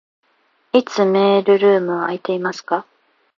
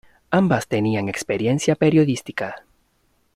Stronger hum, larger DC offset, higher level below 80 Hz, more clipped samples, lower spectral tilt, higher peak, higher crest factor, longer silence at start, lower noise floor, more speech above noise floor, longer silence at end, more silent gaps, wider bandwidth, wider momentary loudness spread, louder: neither; neither; second, -72 dBFS vs -54 dBFS; neither; about the same, -6 dB/octave vs -6 dB/octave; about the same, 0 dBFS vs -2 dBFS; about the same, 18 dB vs 18 dB; first, 0.75 s vs 0.3 s; about the same, -62 dBFS vs -65 dBFS; about the same, 46 dB vs 45 dB; second, 0.55 s vs 0.75 s; neither; second, 7.2 kHz vs 14.5 kHz; about the same, 10 LU vs 12 LU; first, -17 LUFS vs -21 LUFS